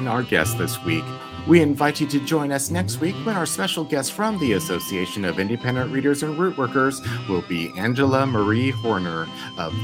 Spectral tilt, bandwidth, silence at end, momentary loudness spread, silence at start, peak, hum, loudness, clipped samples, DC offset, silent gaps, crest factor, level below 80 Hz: -5 dB/octave; 17 kHz; 0 s; 7 LU; 0 s; -2 dBFS; none; -22 LUFS; under 0.1%; under 0.1%; none; 20 dB; -54 dBFS